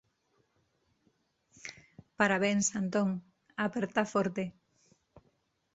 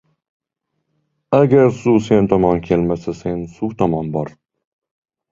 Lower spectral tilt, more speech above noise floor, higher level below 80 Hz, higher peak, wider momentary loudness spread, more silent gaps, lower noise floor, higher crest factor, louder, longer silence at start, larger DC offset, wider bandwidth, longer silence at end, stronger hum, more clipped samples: second, -4.5 dB/octave vs -8.5 dB/octave; second, 44 dB vs 59 dB; second, -72 dBFS vs -44 dBFS; second, -12 dBFS vs 0 dBFS; first, 19 LU vs 12 LU; neither; about the same, -75 dBFS vs -74 dBFS; first, 24 dB vs 18 dB; second, -31 LUFS vs -17 LUFS; first, 1.65 s vs 1.3 s; neither; about the same, 8 kHz vs 7.6 kHz; first, 1.25 s vs 1.05 s; neither; neither